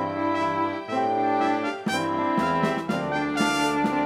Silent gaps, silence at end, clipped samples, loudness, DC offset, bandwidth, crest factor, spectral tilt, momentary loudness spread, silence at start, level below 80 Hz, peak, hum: none; 0 s; under 0.1%; -25 LUFS; under 0.1%; 15.5 kHz; 16 dB; -5 dB/octave; 4 LU; 0 s; -58 dBFS; -10 dBFS; none